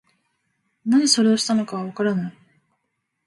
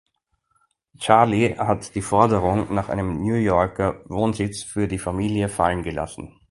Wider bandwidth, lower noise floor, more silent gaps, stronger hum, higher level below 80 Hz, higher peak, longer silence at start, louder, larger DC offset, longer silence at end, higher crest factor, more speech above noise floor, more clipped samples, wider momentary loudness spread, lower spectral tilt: about the same, 11.5 kHz vs 11.5 kHz; first, -76 dBFS vs -70 dBFS; neither; neither; second, -70 dBFS vs -42 dBFS; about the same, -2 dBFS vs 0 dBFS; second, 0.85 s vs 1 s; about the same, -20 LUFS vs -22 LUFS; neither; first, 0.95 s vs 0.25 s; about the same, 20 dB vs 22 dB; first, 56 dB vs 49 dB; neither; first, 13 LU vs 9 LU; second, -4 dB/octave vs -6 dB/octave